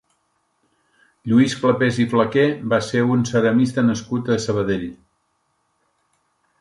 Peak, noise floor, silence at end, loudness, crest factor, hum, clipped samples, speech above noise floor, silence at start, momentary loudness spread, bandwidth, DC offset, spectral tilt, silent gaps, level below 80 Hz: -4 dBFS; -69 dBFS; 1.65 s; -19 LUFS; 18 dB; none; under 0.1%; 50 dB; 1.25 s; 7 LU; 11.5 kHz; under 0.1%; -6 dB/octave; none; -54 dBFS